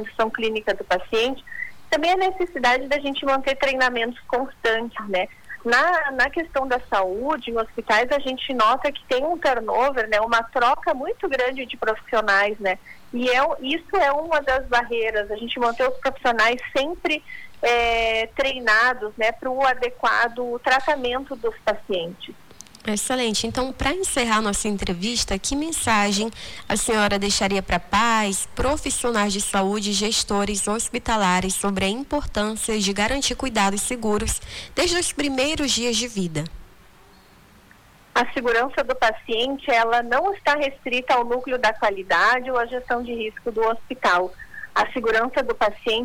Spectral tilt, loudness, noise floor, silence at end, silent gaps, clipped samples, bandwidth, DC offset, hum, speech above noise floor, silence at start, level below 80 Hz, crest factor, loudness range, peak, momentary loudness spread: -2.5 dB/octave; -22 LUFS; -51 dBFS; 0 s; none; under 0.1%; 19 kHz; under 0.1%; none; 29 dB; 0 s; -42 dBFS; 14 dB; 3 LU; -8 dBFS; 7 LU